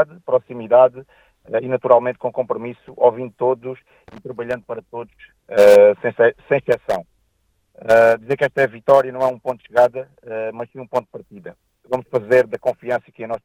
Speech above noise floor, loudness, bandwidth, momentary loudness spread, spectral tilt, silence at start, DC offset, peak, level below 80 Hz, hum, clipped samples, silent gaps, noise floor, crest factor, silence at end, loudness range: 47 dB; -18 LUFS; 16.5 kHz; 18 LU; -6 dB/octave; 0 s; under 0.1%; 0 dBFS; -58 dBFS; none; under 0.1%; none; -65 dBFS; 18 dB; 0.1 s; 7 LU